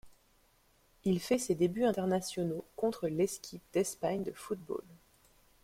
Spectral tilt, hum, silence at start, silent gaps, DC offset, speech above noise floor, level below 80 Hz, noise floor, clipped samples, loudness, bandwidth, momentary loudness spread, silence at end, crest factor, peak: -5.5 dB/octave; none; 0.05 s; none; under 0.1%; 35 dB; -68 dBFS; -69 dBFS; under 0.1%; -34 LUFS; 16.5 kHz; 9 LU; 0.7 s; 18 dB; -18 dBFS